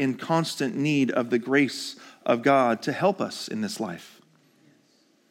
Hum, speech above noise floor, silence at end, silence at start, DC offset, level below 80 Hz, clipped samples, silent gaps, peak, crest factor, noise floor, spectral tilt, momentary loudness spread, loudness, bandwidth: none; 38 dB; 1.25 s; 0 s; under 0.1%; -80 dBFS; under 0.1%; none; -8 dBFS; 18 dB; -63 dBFS; -5 dB/octave; 12 LU; -25 LUFS; 16.5 kHz